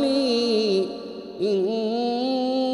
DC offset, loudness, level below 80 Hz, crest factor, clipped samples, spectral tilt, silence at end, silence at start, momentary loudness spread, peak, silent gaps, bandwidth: under 0.1%; -23 LUFS; -64 dBFS; 12 dB; under 0.1%; -5.5 dB/octave; 0 s; 0 s; 8 LU; -10 dBFS; none; 11.5 kHz